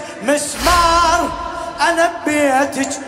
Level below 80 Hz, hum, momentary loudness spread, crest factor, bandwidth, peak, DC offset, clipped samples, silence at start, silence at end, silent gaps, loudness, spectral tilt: -34 dBFS; none; 8 LU; 16 dB; 16 kHz; 0 dBFS; under 0.1%; under 0.1%; 0 s; 0 s; none; -15 LUFS; -3 dB/octave